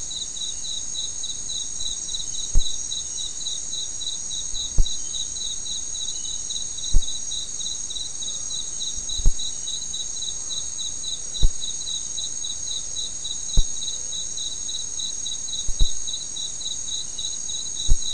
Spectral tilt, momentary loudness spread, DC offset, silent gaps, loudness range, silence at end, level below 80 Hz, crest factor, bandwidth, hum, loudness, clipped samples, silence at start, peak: -0.5 dB/octave; 2 LU; 2%; none; 0 LU; 0 s; -28 dBFS; 20 dB; 11 kHz; none; -26 LUFS; under 0.1%; 0 s; -4 dBFS